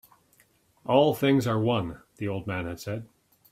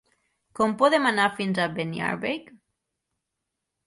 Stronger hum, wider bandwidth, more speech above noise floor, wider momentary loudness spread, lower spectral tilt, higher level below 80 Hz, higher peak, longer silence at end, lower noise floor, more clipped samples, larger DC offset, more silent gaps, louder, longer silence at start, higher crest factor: neither; first, 16 kHz vs 11.5 kHz; second, 38 dB vs 59 dB; first, 15 LU vs 10 LU; first, -6.5 dB/octave vs -5 dB/octave; first, -60 dBFS vs -66 dBFS; about the same, -8 dBFS vs -6 dBFS; second, 0.45 s vs 1.45 s; second, -64 dBFS vs -83 dBFS; neither; neither; neither; about the same, -26 LUFS vs -24 LUFS; first, 0.85 s vs 0.55 s; about the same, 20 dB vs 20 dB